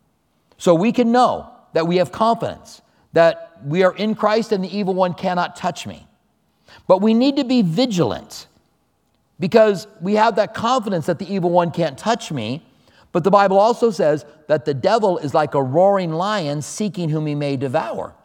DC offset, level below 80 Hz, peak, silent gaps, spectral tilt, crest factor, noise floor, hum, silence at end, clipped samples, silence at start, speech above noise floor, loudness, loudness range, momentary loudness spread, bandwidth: under 0.1%; -60 dBFS; 0 dBFS; none; -6 dB/octave; 18 dB; -64 dBFS; none; 0.15 s; under 0.1%; 0.6 s; 47 dB; -18 LUFS; 2 LU; 11 LU; 16 kHz